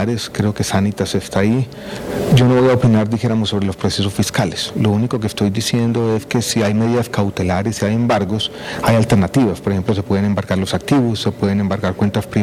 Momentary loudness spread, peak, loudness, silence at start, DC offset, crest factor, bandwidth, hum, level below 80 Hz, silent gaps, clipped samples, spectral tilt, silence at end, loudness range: 6 LU; -4 dBFS; -17 LUFS; 0 s; under 0.1%; 12 dB; 15.5 kHz; none; -42 dBFS; none; under 0.1%; -6 dB/octave; 0 s; 2 LU